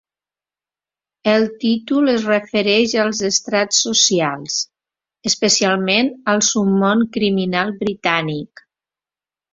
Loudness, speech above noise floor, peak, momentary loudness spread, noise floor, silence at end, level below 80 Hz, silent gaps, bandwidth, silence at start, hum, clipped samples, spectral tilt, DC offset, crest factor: -17 LUFS; over 73 dB; -2 dBFS; 8 LU; under -90 dBFS; 1.1 s; -60 dBFS; none; 7.8 kHz; 1.25 s; none; under 0.1%; -3 dB/octave; under 0.1%; 18 dB